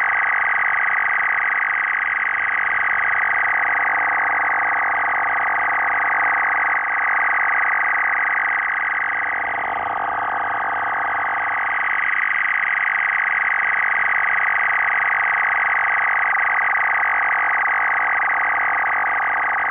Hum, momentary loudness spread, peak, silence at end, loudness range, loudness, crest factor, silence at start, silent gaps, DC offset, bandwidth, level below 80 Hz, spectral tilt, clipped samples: none; 4 LU; -12 dBFS; 0 s; 3 LU; -18 LUFS; 8 dB; 0 s; none; under 0.1%; 3.8 kHz; -60 dBFS; -5.5 dB/octave; under 0.1%